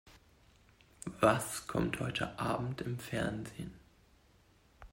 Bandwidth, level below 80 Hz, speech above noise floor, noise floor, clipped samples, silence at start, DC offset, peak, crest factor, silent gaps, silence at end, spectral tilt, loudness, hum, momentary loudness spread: 16 kHz; -58 dBFS; 31 dB; -66 dBFS; under 0.1%; 0.05 s; under 0.1%; -14 dBFS; 24 dB; none; 0.05 s; -5 dB/octave; -35 LUFS; none; 18 LU